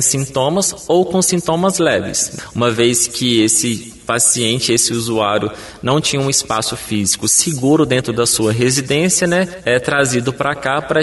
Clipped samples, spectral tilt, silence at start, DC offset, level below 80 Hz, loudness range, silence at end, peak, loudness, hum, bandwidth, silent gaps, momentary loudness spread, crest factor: under 0.1%; -3.5 dB/octave; 0 s; under 0.1%; -46 dBFS; 1 LU; 0 s; 0 dBFS; -15 LUFS; none; 12 kHz; none; 6 LU; 16 dB